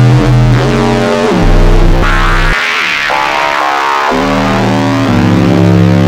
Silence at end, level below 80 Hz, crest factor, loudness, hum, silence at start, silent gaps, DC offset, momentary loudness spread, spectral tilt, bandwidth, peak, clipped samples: 0 s; -14 dBFS; 8 dB; -9 LUFS; none; 0 s; none; under 0.1%; 3 LU; -6 dB/octave; 15 kHz; 0 dBFS; 0.5%